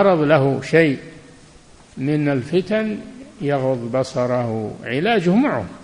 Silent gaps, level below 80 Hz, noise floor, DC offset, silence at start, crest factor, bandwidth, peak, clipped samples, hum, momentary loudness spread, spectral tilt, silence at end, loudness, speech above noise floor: none; -54 dBFS; -46 dBFS; under 0.1%; 0 s; 18 dB; 10.5 kHz; 0 dBFS; under 0.1%; none; 11 LU; -7 dB/octave; 0 s; -19 LUFS; 28 dB